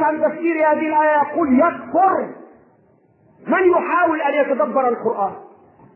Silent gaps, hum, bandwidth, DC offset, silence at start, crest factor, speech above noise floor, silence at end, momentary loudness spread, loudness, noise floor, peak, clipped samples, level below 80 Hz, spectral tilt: none; none; 3.2 kHz; under 0.1%; 0 s; 14 dB; 38 dB; 0.5 s; 7 LU; -17 LUFS; -55 dBFS; -4 dBFS; under 0.1%; -62 dBFS; -9.5 dB/octave